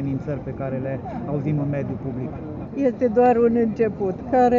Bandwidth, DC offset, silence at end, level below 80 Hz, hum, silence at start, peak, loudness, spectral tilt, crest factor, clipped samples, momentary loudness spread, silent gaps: 7.2 kHz; under 0.1%; 0 s; -46 dBFS; none; 0 s; -6 dBFS; -23 LUFS; -8.5 dB/octave; 16 dB; under 0.1%; 12 LU; none